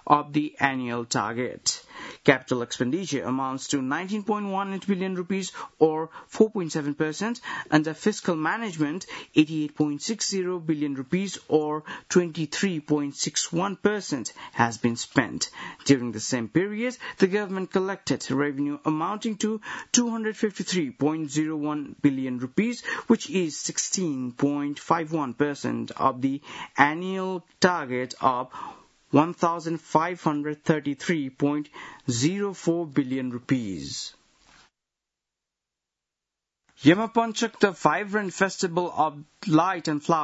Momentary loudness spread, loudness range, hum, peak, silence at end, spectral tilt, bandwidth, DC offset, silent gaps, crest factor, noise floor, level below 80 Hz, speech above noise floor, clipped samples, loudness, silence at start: 8 LU; 3 LU; none; 0 dBFS; 0 s; -4.5 dB/octave; 8 kHz; under 0.1%; none; 26 dB; -87 dBFS; -66 dBFS; 61 dB; under 0.1%; -26 LUFS; 0.05 s